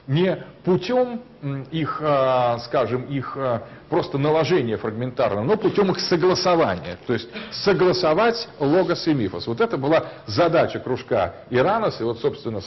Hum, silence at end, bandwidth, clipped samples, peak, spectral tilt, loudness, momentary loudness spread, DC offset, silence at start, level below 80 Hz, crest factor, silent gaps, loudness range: none; 0 s; 6.2 kHz; under 0.1%; -8 dBFS; -6.5 dB/octave; -22 LUFS; 8 LU; under 0.1%; 0.05 s; -54 dBFS; 14 dB; none; 3 LU